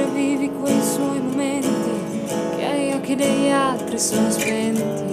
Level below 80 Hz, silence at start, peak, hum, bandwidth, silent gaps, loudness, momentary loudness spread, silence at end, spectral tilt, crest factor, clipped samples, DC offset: -58 dBFS; 0 s; -6 dBFS; none; 16 kHz; none; -21 LUFS; 5 LU; 0 s; -4.5 dB/octave; 14 dB; under 0.1%; under 0.1%